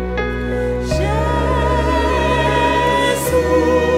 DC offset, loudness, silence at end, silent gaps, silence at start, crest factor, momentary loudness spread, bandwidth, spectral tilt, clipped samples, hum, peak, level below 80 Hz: under 0.1%; -16 LUFS; 0 s; none; 0 s; 12 dB; 6 LU; 16 kHz; -5.5 dB/octave; under 0.1%; none; -4 dBFS; -24 dBFS